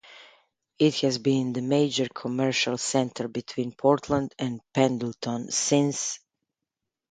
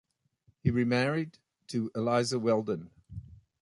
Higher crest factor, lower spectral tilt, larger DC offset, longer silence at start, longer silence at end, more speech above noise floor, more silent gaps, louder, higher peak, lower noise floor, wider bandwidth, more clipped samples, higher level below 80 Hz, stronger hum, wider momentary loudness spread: about the same, 22 dB vs 18 dB; second, -4.5 dB/octave vs -6 dB/octave; neither; second, 0.1 s vs 0.65 s; first, 0.95 s vs 0.25 s; first, 61 dB vs 40 dB; neither; first, -26 LUFS vs -30 LUFS; first, -6 dBFS vs -12 dBFS; first, -86 dBFS vs -69 dBFS; second, 9.6 kHz vs 11.5 kHz; neither; second, -62 dBFS vs -56 dBFS; neither; second, 9 LU vs 19 LU